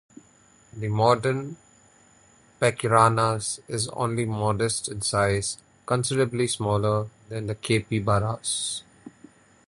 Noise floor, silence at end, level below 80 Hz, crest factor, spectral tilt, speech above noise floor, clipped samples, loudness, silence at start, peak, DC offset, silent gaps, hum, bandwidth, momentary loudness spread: -57 dBFS; 0.6 s; -52 dBFS; 22 dB; -4.5 dB/octave; 33 dB; under 0.1%; -25 LUFS; 0.75 s; -4 dBFS; under 0.1%; none; none; 11.5 kHz; 11 LU